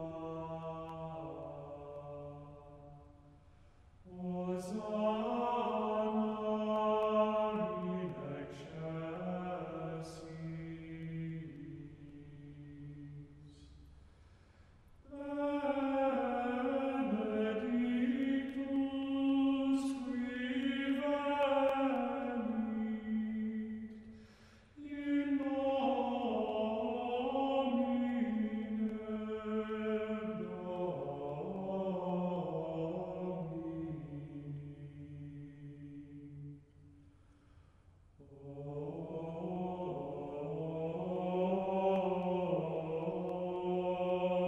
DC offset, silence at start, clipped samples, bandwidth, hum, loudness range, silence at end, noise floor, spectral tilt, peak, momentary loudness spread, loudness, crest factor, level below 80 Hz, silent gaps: under 0.1%; 0 s; under 0.1%; 11 kHz; none; 14 LU; 0 s; -64 dBFS; -7.5 dB/octave; -20 dBFS; 17 LU; -37 LUFS; 16 dB; -66 dBFS; none